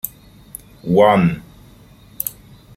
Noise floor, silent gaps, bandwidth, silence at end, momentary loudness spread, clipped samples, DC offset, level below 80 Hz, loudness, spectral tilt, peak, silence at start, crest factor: -45 dBFS; none; 16.5 kHz; 0.45 s; 24 LU; under 0.1%; under 0.1%; -48 dBFS; -17 LUFS; -6 dB/octave; -2 dBFS; 0.05 s; 18 dB